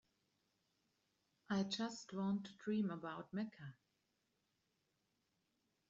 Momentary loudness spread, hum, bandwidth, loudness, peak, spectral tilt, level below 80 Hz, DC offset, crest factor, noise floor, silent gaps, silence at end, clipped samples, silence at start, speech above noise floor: 8 LU; none; 7.8 kHz; -44 LUFS; -28 dBFS; -5 dB/octave; -86 dBFS; under 0.1%; 18 dB; -85 dBFS; none; 2.15 s; under 0.1%; 1.5 s; 42 dB